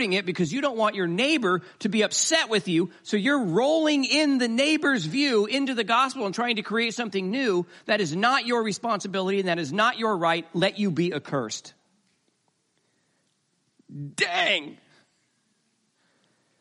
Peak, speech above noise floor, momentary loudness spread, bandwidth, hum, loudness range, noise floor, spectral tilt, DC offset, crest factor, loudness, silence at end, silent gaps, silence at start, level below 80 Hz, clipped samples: -6 dBFS; 47 dB; 6 LU; 11.5 kHz; none; 7 LU; -72 dBFS; -3.5 dB/octave; under 0.1%; 20 dB; -24 LUFS; 1.85 s; none; 0 s; -76 dBFS; under 0.1%